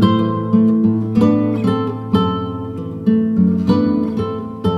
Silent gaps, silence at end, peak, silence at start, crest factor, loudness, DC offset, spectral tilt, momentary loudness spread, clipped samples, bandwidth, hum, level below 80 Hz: none; 0 s; -2 dBFS; 0 s; 14 dB; -17 LUFS; under 0.1%; -9 dB/octave; 8 LU; under 0.1%; 5.6 kHz; none; -46 dBFS